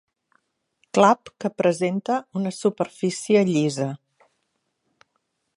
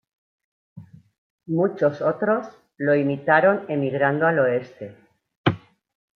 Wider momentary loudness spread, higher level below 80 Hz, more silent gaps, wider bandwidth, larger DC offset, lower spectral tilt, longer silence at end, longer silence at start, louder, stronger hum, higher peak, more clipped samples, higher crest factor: second, 10 LU vs 17 LU; second, -72 dBFS vs -66 dBFS; second, none vs 1.18-1.38 s, 5.37-5.44 s; first, 11.5 kHz vs 6.4 kHz; neither; second, -5.5 dB/octave vs -8.5 dB/octave; first, 1.6 s vs 0.6 s; first, 0.95 s vs 0.75 s; about the same, -22 LUFS vs -22 LUFS; neither; about the same, -2 dBFS vs -4 dBFS; neither; about the same, 22 dB vs 20 dB